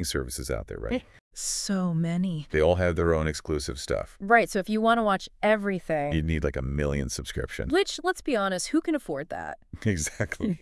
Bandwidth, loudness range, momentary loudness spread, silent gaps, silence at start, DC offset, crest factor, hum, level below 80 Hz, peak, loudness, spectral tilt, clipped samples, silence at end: 12 kHz; 3 LU; 10 LU; 1.21-1.31 s; 0 s; under 0.1%; 20 dB; none; -42 dBFS; -6 dBFS; -27 LUFS; -5 dB/octave; under 0.1%; 0.05 s